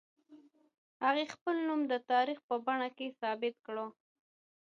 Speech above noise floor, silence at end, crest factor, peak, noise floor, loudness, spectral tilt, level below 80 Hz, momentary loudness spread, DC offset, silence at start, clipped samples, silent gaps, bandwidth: 27 dB; 0.75 s; 18 dB; -18 dBFS; -61 dBFS; -35 LUFS; -4 dB/octave; under -90 dBFS; 10 LU; under 0.1%; 0.3 s; under 0.1%; 0.78-1.00 s, 1.41-1.46 s, 2.43-2.49 s; 7.8 kHz